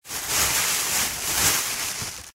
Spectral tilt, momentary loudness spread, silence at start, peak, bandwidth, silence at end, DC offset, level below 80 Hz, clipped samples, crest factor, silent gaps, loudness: 0 dB/octave; 7 LU; 0.05 s; -6 dBFS; 16 kHz; 0.05 s; under 0.1%; -46 dBFS; under 0.1%; 18 dB; none; -21 LUFS